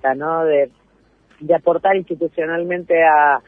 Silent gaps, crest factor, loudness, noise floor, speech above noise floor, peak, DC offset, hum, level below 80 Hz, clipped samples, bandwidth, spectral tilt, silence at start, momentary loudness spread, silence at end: none; 16 dB; -17 LUFS; -56 dBFS; 40 dB; -2 dBFS; under 0.1%; none; -60 dBFS; under 0.1%; 3.7 kHz; -8.5 dB/octave; 0.05 s; 10 LU; 0.1 s